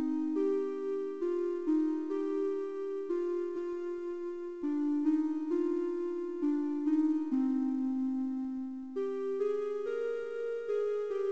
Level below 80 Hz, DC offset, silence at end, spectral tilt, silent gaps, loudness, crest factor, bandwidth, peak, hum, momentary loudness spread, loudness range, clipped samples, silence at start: -76 dBFS; 0.2%; 0 s; -6.5 dB/octave; none; -34 LUFS; 12 dB; 7.4 kHz; -20 dBFS; none; 7 LU; 3 LU; under 0.1%; 0 s